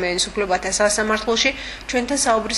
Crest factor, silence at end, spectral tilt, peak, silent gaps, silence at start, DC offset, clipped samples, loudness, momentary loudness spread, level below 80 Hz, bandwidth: 18 dB; 0 s; -1.5 dB/octave; -2 dBFS; none; 0 s; under 0.1%; under 0.1%; -19 LUFS; 6 LU; -42 dBFS; 12 kHz